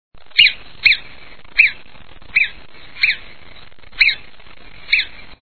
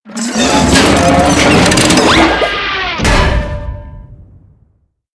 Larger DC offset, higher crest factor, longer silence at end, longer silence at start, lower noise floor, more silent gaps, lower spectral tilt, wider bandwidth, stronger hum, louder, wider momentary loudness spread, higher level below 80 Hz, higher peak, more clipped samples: first, 2% vs under 0.1%; first, 20 dB vs 12 dB; second, 0 s vs 0.9 s; about the same, 0.1 s vs 0.05 s; second, -43 dBFS vs -55 dBFS; neither; second, -1.5 dB/octave vs -4 dB/octave; second, 5.4 kHz vs 11 kHz; neither; second, -15 LUFS vs -9 LUFS; about the same, 9 LU vs 11 LU; second, -48 dBFS vs -22 dBFS; about the same, 0 dBFS vs 0 dBFS; second, under 0.1% vs 0.2%